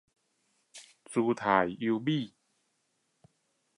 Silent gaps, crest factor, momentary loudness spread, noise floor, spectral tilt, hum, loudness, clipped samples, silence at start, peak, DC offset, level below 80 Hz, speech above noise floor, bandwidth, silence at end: none; 24 dB; 24 LU; -77 dBFS; -6 dB/octave; none; -30 LUFS; under 0.1%; 0.75 s; -10 dBFS; under 0.1%; -70 dBFS; 48 dB; 11.5 kHz; 1.5 s